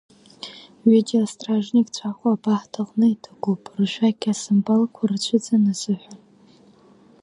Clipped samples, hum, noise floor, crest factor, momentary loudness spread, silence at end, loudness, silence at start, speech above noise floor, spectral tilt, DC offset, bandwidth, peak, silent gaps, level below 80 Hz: under 0.1%; none; -52 dBFS; 16 dB; 10 LU; 1.05 s; -21 LUFS; 0.45 s; 32 dB; -6 dB/octave; under 0.1%; 11 kHz; -4 dBFS; none; -72 dBFS